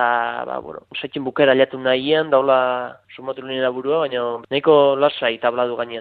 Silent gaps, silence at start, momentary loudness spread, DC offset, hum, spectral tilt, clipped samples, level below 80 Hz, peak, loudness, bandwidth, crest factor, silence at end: none; 0 s; 15 LU; under 0.1%; none; -8 dB/octave; under 0.1%; -64 dBFS; -2 dBFS; -19 LUFS; 4.7 kHz; 18 dB; 0 s